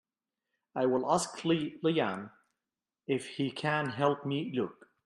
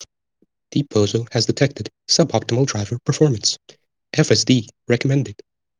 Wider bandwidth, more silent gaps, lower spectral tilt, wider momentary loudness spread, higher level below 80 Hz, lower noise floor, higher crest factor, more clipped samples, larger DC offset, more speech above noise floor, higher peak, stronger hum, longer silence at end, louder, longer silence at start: first, 12.5 kHz vs 10 kHz; neither; about the same, -5 dB/octave vs -4.5 dB/octave; first, 11 LU vs 8 LU; second, -76 dBFS vs -58 dBFS; first, under -90 dBFS vs -66 dBFS; about the same, 20 dB vs 20 dB; neither; neither; first, over 59 dB vs 47 dB; second, -14 dBFS vs 0 dBFS; neither; about the same, 0.35 s vs 0.45 s; second, -32 LUFS vs -19 LUFS; first, 0.75 s vs 0 s